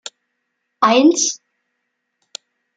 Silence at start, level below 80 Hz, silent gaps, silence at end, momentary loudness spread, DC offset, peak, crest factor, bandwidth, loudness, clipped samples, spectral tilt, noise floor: 0.8 s; -74 dBFS; none; 1.4 s; 24 LU; under 0.1%; -2 dBFS; 18 dB; 9.4 kHz; -15 LUFS; under 0.1%; -2 dB/octave; -74 dBFS